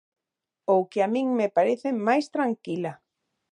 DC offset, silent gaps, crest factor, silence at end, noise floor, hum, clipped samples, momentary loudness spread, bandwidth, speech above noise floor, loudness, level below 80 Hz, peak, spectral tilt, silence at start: under 0.1%; none; 16 dB; 0.55 s; -87 dBFS; none; under 0.1%; 9 LU; 10.5 kHz; 62 dB; -25 LUFS; -80 dBFS; -8 dBFS; -6.5 dB/octave; 0.7 s